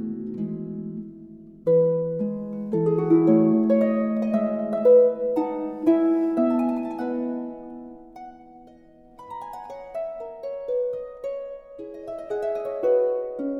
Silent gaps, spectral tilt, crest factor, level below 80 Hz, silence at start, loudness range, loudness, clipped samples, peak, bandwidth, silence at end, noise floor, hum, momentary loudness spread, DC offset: none; -10.5 dB/octave; 16 dB; -62 dBFS; 0 s; 14 LU; -23 LUFS; under 0.1%; -8 dBFS; 5.6 kHz; 0 s; -51 dBFS; none; 20 LU; under 0.1%